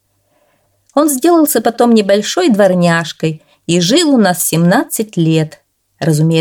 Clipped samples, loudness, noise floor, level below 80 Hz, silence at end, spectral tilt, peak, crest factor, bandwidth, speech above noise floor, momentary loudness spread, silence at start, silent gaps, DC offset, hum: under 0.1%; -12 LUFS; -58 dBFS; -60 dBFS; 0 s; -5 dB/octave; 0 dBFS; 12 dB; 18.5 kHz; 47 dB; 9 LU; 0.95 s; none; under 0.1%; none